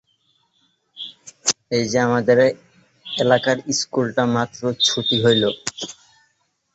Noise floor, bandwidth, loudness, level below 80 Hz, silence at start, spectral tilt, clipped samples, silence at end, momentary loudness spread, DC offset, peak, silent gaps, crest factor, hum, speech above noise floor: -67 dBFS; 8.2 kHz; -19 LUFS; -60 dBFS; 0.95 s; -3.5 dB/octave; under 0.1%; 0.85 s; 18 LU; under 0.1%; -2 dBFS; none; 20 dB; none; 48 dB